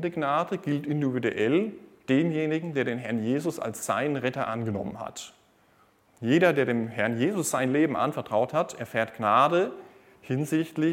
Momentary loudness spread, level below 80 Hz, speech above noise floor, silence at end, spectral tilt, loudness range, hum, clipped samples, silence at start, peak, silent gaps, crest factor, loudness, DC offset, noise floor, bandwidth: 11 LU; -70 dBFS; 36 dB; 0 s; -5.5 dB/octave; 5 LU; none; under 0.1%; 0 s; -6 dBFS; none; 20 dB; -27 LUFS; under 0.1%; -62 dBFS; 17 kHz